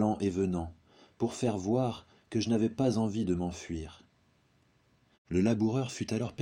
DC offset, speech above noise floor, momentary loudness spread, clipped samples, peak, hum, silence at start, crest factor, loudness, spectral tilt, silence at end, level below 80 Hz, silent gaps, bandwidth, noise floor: under 0.1%; 38 dB; 11 LU; under 0.1%; -14 dBFS; none; 0 s; 18 dB; -32 LUFS; -6.5 dB/octave; 0 s; -56 dBFS; 5.18-5.25 s; 11.5 kHz; -69 dBFS